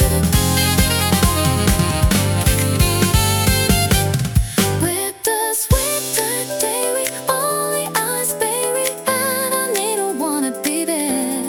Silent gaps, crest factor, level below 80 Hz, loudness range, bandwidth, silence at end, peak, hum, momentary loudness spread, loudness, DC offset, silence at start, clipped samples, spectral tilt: none; 16 dB; -28 dBFS; 3 LU; 19 kHz; 0 s; -2 dBFS; none; 4 LU; -17 LUFS; under 0.1%; 0 s; under 0.1%; -4 dB/octave